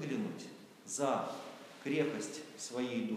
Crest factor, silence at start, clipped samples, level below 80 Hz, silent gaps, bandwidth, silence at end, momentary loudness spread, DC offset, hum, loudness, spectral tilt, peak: 18 dB; 0 s; under 0.1%; under -90 dBFS; none; 15.5 kHz; 0 s; 14 LU; under 0.1%; none; -38 LUFS; -4.5 dB/octave; -20 dBFS